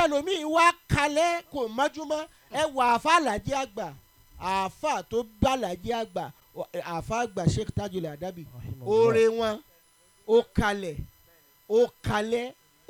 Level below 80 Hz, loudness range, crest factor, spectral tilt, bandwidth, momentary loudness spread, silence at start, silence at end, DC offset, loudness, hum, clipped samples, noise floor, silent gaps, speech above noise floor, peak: -48 dBFS; 5 LU; 20 dB; -5 dB/octave; 19 kHz; 16 LU; 0 s; 0.4 s; under 0.1%; -27 LUFS; none; under 0.1%; -61 dBFS; none; 35 dB; -6 dBFS